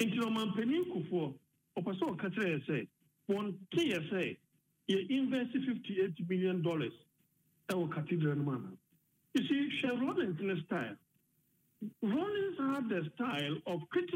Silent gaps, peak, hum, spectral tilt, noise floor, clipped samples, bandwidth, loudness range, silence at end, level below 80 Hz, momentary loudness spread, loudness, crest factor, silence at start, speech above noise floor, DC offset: none; -20 dBFS; none; -6.5 dB/octave; -76 dBFS; under 0.1%; 16 kHz; 2 LU; 0 s; -82 dBFS; 9 LU; -36 LUFS; 16 dB; 0 s; 40 dB; under 0.1%